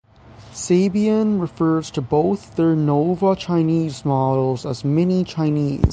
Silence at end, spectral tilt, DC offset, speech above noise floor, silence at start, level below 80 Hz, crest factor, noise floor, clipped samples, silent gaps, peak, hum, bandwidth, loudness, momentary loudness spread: 0 s; -7.5 dB/octave; under 0.1%; 26 dB; 0.4 s; -36 dBFS; 16 dB; -44 dBFS; under 0.1%; none; -2 dBFS; none; 9.6 kHz; -19 LUFS; 4 LU